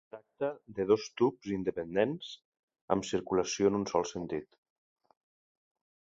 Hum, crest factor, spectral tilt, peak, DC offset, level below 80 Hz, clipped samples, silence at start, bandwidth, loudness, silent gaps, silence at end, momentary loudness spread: none; 22 dB; -5 dB/octave; -10 dBFS; under 0.1%; -64 dBFS; under 0.1%; 0.15 s; 8 kHz; -32 LUFS; 2.45-2.52 s, 2.59-2.68 s, 2.81-2.88 s; 1.6 s; 12 LU